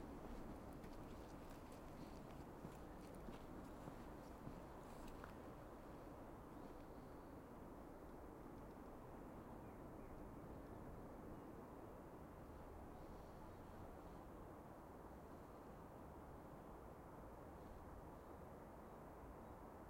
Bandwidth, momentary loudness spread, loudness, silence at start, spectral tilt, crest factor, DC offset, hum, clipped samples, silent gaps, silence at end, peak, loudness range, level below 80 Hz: 16 kHz; 2 LU; -58 LUFS; 0 s; -7 dB/octave; 20 dB; under 0.1%; none; under 0.1%; none; 0 s; -36 dBFS; 2 LU; -64 dBFS